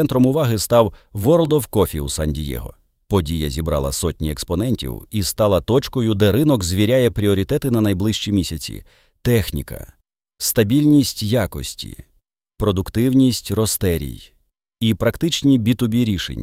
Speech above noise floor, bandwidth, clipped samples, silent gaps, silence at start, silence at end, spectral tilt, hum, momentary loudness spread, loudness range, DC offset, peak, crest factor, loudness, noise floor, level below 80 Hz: 46 dB; 16.5 kHz; under 0.1%; none; 0 s; 0 s; -5.5 dB/octave; none; 11 LU; 4 LU; under 0.1%; -2 dBFS; 16 dB; -19 LUFS; -64 dBFS; -36 dBFS